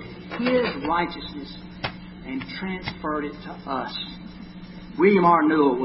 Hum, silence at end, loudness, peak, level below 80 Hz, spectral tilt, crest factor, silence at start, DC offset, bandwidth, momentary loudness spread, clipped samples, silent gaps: none; 0 s; -24 LUFS; -6 dBFS; -50 dBFS; -10.5 dB/octave; 18 dB; 0 s; under 0.1%; 5.8 kHz; 21 LU; under 0.1%; none